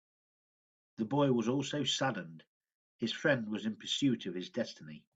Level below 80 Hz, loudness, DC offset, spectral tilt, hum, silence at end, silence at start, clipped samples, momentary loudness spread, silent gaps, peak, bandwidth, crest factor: -78 dBFS; -34 LUFS; under 0.1%; -4.5 dB/octave; none; 0.2 s; 1 s; under 0.1%; 11 LU; 2.47-2.60 s, 2.75-2.99 s; -16 dBFS; 9 kHz; 20 dB